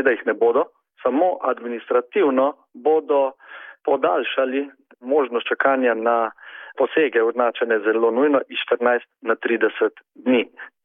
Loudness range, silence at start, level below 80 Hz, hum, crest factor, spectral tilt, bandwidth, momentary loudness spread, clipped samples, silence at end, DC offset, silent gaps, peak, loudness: 2 LU; 0 s; -80 dBFS; none; 16 dB; -8 dB/octave; 3.8 kHz; 10 LU; under 0.1%; 0.15 s; under 0.1%; none; -4 dBFS; -21 LUFS